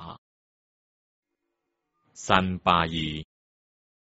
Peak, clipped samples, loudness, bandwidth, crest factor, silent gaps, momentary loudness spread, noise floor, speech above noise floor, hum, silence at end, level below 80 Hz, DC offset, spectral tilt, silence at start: -2 dBFS; under 0.1%; -24 LUFS; 8 kHz; 28 dB; 0.18-1.23 s; 17 LU; -81 dBFS; 57 dB; none; 0.8 s; -52 dBFS; under 0.1%; -3 dB/octave; 0 s